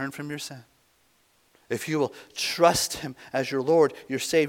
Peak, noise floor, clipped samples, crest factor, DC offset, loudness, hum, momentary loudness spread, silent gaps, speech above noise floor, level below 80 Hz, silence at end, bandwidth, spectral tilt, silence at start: -6 dBFS; -65 dBFS; under 0.1%; 22 dB; under 0.1%; -26 LUFS; none; 14 LU; none; 39 dB; -62 dBFS; 0 s; 18 kHz; -3.5 dB/octave; 0 s